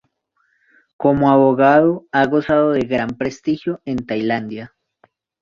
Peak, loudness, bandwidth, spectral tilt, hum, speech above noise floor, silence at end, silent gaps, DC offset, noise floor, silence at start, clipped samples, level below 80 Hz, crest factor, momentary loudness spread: -2 dBFS; -17 LUFS; 7.2 kHz; -7.5 dB/octave; none; 50 dB; 0.75 s; none; under 0.1%; -66 dBFS; 1 s; under 0.1%; -52 dBFS; 16 dB; 11 LU